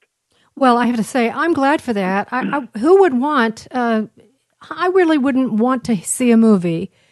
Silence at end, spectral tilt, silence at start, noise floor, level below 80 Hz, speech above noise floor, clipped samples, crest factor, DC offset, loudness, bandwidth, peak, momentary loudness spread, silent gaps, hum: 0.25 s; -5.5 dB/octave; 0.55 s; -61 dBFS; -62 dBFS; 46 dB; under 0.1%; 16 dB; under 0.1%; -16 LUFS; 12 kHz; -2 dBFS; 9 LU; none; none